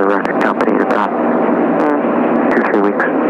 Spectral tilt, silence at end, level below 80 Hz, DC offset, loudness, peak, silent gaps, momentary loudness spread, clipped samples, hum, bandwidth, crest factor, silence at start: -7.5 dB/octave; 0 s; -58 dBFS; under 0.1%; -14 LUFS; -2 dBFS; none; 2 LU; under 0.1%; none; 8.4 kHz; 12 dB; 0 s